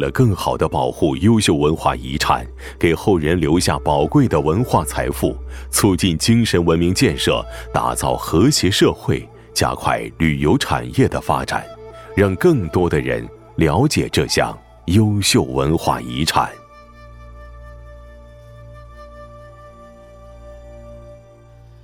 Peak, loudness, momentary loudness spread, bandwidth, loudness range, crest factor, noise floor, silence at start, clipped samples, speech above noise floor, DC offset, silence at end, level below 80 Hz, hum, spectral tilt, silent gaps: 0 dBFS; -17 LUFS; 9 LU; 17 kHz; 3 LU; 18 dB; -44 dBFS; 0 s; under 0.1%; 27 dB; under 0.1%; 0.65 s; -36 dBFS; none; -5 dB/octave; none